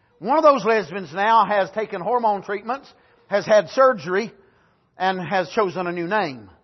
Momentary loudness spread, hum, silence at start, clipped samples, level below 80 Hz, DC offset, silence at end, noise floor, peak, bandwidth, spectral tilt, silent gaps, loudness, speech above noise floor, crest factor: 11 LU; none; 0.2 s; under 0.1%; -68 dBFS; under 0.1%; 0.15 s; -60 dBFS; -4 dBFS; 6.2 kHz; -5.5 dB/octave; none; -21 LUFS; 39 dB; 18 dB